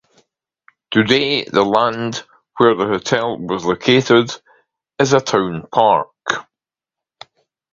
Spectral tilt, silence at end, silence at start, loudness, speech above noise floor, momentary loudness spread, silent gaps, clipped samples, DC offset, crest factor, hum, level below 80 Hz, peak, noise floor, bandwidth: -4.5 dB/octave; 1.3 s; 0.9 s; -16 LUFS; 72 dB; 10 LU; none; under 0.1%; under 0.1%; 18 dB; none; -56 dBFS; 0 dBFS; -87 dBFS; 7.6 kHz